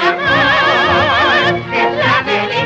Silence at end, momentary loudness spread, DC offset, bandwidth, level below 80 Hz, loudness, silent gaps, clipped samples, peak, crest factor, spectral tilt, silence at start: 0 s; 4 LU; under 0.1%; 8.4 kHz; -42 dBFS; -12 LUFS; none; under 0.1%; -2 dBFS; 10 dB; -5 dB/octave; 0 s